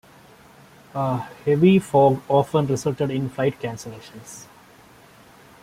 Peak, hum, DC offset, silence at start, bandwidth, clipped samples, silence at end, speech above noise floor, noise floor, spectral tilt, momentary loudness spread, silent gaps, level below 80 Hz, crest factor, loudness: -4 dBFS; none; under 0.1%; 0.95 s; 15.5 kHz; under 0.1%; 1.2 s; 29 dB; -50 dBFS; -7 dB/octave; 23 LU; none; -58 dBFS; 18 dB; -21 LUFS